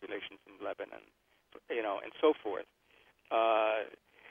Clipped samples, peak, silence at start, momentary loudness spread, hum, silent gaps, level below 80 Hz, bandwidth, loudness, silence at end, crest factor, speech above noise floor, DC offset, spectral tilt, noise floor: under 0.1%; -14 dBFS; 0 s; 17 LU; none; none; -80 dBFS; 3.9 kHz; -34 LUFS; 0 s; 22 dB; 37 dB; under 0.1%; -5.5 dB/octave; -68 dBFS